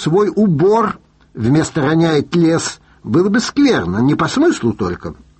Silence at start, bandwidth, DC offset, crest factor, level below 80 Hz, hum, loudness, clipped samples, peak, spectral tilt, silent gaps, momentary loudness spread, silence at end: 0 s; 8.8 kHz; under 0.1%; 12 dB; -46 dBFS; none; -15 LUFS; under 0.1%; -2 dBFS; -6 dB/octave; none; 9 LU; 0.25 s